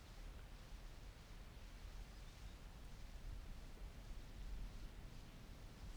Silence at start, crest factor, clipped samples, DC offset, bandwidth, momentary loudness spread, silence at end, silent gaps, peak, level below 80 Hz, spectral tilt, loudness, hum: 0 s; 14 dB; under 0.1%; under 0.1%; over 20 kHz; 4 LU; 0 s; none; -40 dBFS; -54 dBFS; -5 dB/octave; -58 LUFS; none